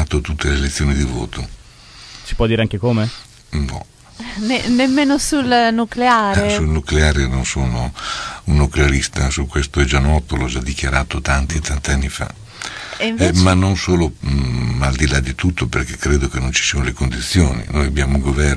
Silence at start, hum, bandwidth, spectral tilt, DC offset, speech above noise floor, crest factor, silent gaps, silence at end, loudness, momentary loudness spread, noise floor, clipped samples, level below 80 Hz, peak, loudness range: 0 s; none; 11 kHz; -5 dB/octave; under 0.1%; 24 dB; 16 dB; none; 0 s; -17 LUFS; 11 LU; -40 dBFS; under 0.1%; -22 dBFS; 0 dBFS; 4 LU